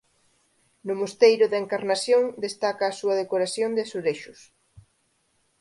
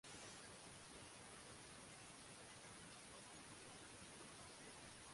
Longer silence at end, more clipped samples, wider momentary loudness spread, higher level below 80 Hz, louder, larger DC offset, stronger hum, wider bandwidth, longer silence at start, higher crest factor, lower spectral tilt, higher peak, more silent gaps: first, 0.8 s vs 0 s; neither; first, 11 LU vs 1 LU; about the same, -72 dBFS vs -76 dBFS; first, -24 LUFS vs -58 LUFS; neither; neither; about the same, 11.5 kHz vs 11.5 kHz; first, 0.85 s vs 0.05 s; first, 20 dB vs 14 dB; about the same, -3.5 dB/octave vs -2.5 dB/octave; first, -4 dBFS vs -46 dBFS; neither